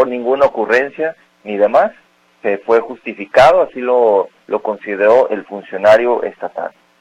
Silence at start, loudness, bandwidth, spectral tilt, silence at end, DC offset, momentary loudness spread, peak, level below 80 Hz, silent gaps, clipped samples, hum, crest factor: 0 s; -14 LUFS; 11 kHz; -5 dB/octave; 0.3 s; under 0.1%; 14 LU; 0 dBFS; -52 dBFS; none; under 0.1%; none; 14 dB